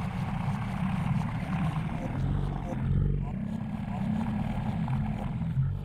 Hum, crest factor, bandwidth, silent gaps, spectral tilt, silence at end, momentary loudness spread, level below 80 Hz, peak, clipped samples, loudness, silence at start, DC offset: none; 14 dB; 10.5 kHz; none; -8.5 dB/octave; 0 s; 4 LU; -40 dBFS; -16 dBFS; under 0.1%; -31 LUFS; 0 s; under 0.1%